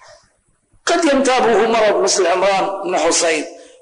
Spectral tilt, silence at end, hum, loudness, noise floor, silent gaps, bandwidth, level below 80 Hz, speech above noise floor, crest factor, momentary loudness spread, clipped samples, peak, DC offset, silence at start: -2 dB/octave; 0.25 s; none; -15 LUFS; -59 dBFS; none; 10.5 kHz; -52 dBFS; 45 dB; 10 dB; 6 LU; under 0.1%; -6 dBFS; under 0.1%; 0.85 s